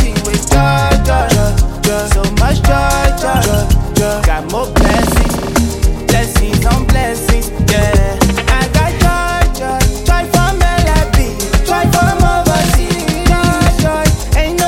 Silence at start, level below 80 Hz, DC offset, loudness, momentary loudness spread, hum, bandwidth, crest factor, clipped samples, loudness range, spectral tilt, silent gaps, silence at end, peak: 0 s; -14 dBFS; under 0.1%; -13 LUFS; 4 LU; none; 17 kHz; 10 dB; under 0.1%; 1 LU; -5 dB/octave; none; 0 s; 0 dBFS